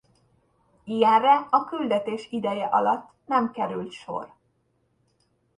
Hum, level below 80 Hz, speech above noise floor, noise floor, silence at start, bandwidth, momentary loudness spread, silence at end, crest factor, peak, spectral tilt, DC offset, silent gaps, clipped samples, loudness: none; -70 dBFS; 46 dB; -70 dBFS; 0.85 s; 10.5 kHz; 15 LU; 1.3 s; 20 dB; -6 dBFS; -6 dB/octave; under 0.1%; none; under 0.1%; -24 LUFS